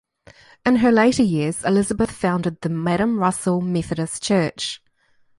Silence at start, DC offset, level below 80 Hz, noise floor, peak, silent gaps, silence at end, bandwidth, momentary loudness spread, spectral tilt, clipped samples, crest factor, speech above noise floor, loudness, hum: 0.65 s; under 0.1%; -50 dBFS; -59 dBFS; -2 dBFS; none; 0.6 s; 11.5 kHz; 9 LU; -5.5 dB/octave; under 0.1%; 18 dB; 40 dB; -20 LUFS; none